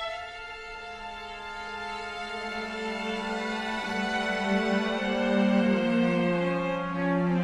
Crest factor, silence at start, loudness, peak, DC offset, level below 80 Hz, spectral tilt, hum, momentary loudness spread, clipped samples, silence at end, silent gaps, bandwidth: 16 dB; 0 s; -29 LUFS; -12 dBFS; under 0.1%; -56 dBFS; -6 dB/octave; none; 14 LU; under 0.1%; 0 s; none; 11.5 kHz